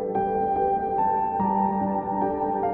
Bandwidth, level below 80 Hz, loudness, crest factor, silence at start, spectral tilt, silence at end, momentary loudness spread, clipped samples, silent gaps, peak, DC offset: 3.4 kHz; -50 dBFS; -24 LUFS; 12 dB; 0 s; -8.5 dB/octave; 0 s; 2 LU; under 0.1%; none; -12 dBFS; under 0.1%